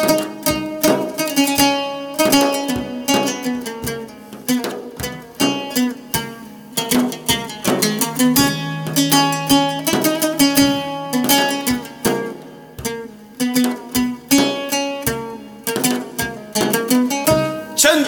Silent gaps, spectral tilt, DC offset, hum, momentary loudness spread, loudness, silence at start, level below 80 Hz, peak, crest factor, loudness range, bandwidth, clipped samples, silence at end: none; -3 dB/octave; under 0.1%; none; 12 LU; -18 LUFS; 0 s; -48 dBFS; -2 dBFS; 16 dB; 5 LU; over 20 kHz; under 0.1%; 0 s